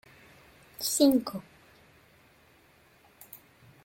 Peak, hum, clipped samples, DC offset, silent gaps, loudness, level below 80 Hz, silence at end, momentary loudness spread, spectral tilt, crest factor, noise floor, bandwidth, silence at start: -10 dBFS; none; under 0.1%; under 0.1%; none; -26 LUFS; -68 dBFS; 0.5 s; 26 LU; -3.5 dB/octave; 24 dB; -61 dBFS; 17 kHz; 0.8 s